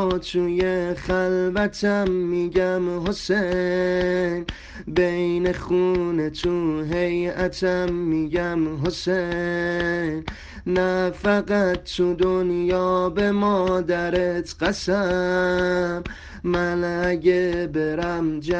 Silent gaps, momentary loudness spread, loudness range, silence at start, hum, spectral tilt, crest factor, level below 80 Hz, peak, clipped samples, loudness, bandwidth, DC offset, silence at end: none; 5 LU; 2 LU; 0 s; none; -6.5 dB/octave; 18 dB; -42 dBFS; -4 dBFS; under 0.1%; -22 LUFS; 8.4 kHz; under 0.1%; 0 s